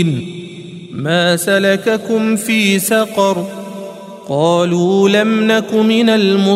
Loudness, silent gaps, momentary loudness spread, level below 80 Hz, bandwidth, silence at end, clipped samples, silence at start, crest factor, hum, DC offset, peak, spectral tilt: -13 LUFS; none; 17 LU; -60 dBFS; 16 kHz; 0 s; under 0.1%; 0 s; 14 dB; none; under 0.1%; 0 dBFS; -5 dB/octave